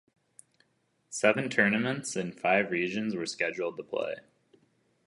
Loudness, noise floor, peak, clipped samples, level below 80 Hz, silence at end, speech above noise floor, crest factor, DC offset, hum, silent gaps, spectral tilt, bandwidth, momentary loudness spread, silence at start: -29 LUFS; -73 dBFS; -8 dBFS; under 0.1%; -74 dBFS; 0.85 s; 44 dB; 24 dB; under 0.1%; none; none; -4.5 dB/octave; 11.5 kHz; 10 LU; 1.1 s